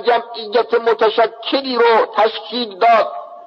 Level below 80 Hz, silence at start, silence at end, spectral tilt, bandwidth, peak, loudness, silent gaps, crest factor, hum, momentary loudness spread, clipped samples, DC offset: -76 dBFS; 0 s; 0 s; -4.5 dB/octave; 6.2 kHz; -2 dBFS; -16 LUFS; none; 12 dB; none; 7 LU; under 0.1%; under 0.1%